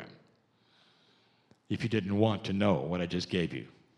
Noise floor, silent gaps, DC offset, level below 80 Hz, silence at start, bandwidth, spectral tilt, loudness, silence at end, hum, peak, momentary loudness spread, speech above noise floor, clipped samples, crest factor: -68 dBFS; none; under 0.1%; -64 dBFS; 0 s; 10.5 kHz; -7 dB/octave; -31 LUFS; 0.3 s; none; -12 dBFS; 10 LU; 37 dB; under 0.1%; 22 dB